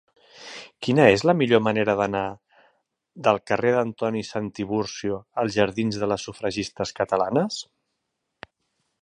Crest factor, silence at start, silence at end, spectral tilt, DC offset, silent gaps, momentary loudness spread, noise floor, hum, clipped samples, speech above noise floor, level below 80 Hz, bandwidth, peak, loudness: 24 dB; 0.4 s; 1.4 s; -5.5 dB/octave; under 0.1%; none; 13 LU; -79 dBFS; none; under 0.1%; 56 dB; -58 dBFS; 10.5 kHz; 0 dBFS; -23 LUFS